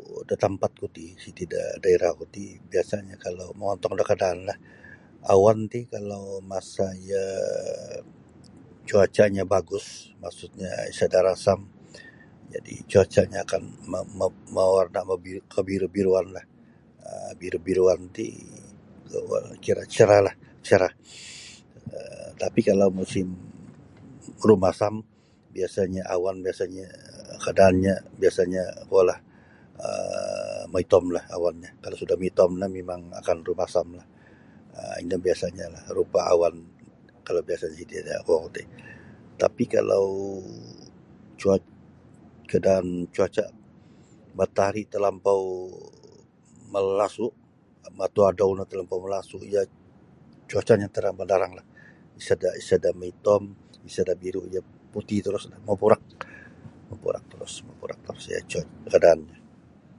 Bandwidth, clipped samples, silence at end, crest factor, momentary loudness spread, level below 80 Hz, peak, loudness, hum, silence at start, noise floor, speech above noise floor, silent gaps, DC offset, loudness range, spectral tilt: 11.5 kHz; under 0.1%; 0.7 s; 24 dB; 19 LU; -52 dBFS; -2 dBFS; -25 LUFS; none; 0.1 s; -54 dBFS; 29 dB; none; under 0.1%; 4 LU; -6 dB/octave